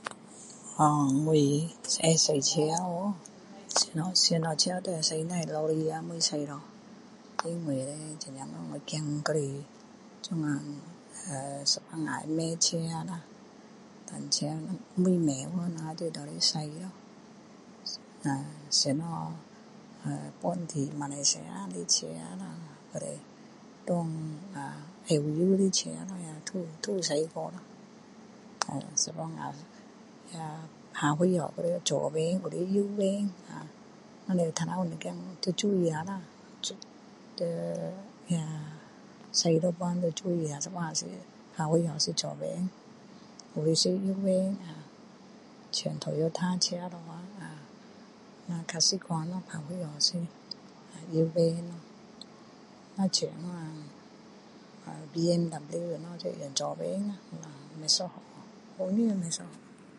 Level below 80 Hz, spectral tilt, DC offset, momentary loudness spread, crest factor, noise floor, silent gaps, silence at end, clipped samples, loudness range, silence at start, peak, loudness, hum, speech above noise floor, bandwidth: -74 dBFS; -4 dB/octave; under 0.1%; 20 LU; 26 dB; -53 dBFS; none; 0 s; under 0.1%; 7 LU; 0 s; -6 dBFS; -31 LUFS; none; 22 dB; 11.5 kHz